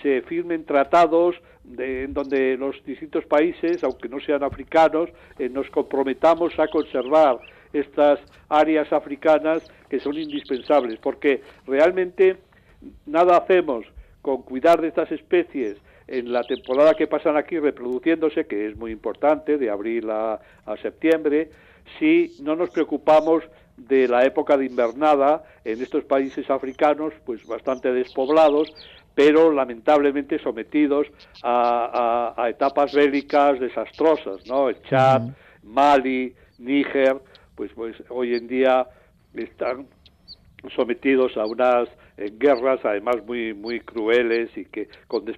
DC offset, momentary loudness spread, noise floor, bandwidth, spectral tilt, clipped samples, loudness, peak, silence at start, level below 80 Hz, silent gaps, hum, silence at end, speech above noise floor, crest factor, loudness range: under 0.1%; 13 LU; -48 dBFS; 8.4 kHz; -6.5 dB/octave; under 0.1%; -21 LUFS; -6 dBFS; 0 s; -56 dBFS; none; none; 0 s; 28 dB; 16 dB; 4 LU